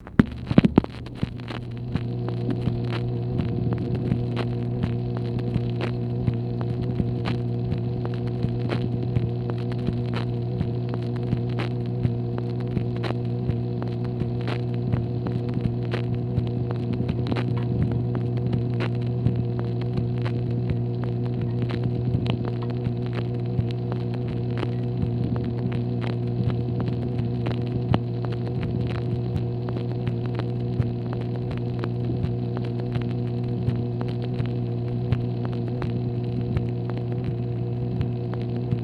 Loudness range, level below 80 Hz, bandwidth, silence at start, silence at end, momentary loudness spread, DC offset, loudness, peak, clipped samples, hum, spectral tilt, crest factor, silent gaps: 2 LU; -42 dBFS; 5 kHz; 0 s; 0 s; 3 LU; under 0.1%; -27 LUFS; 0 dBFS; under 0.1%; 60 Hz at -30 dBFS; -9.5 dB/octave; 24 dB; none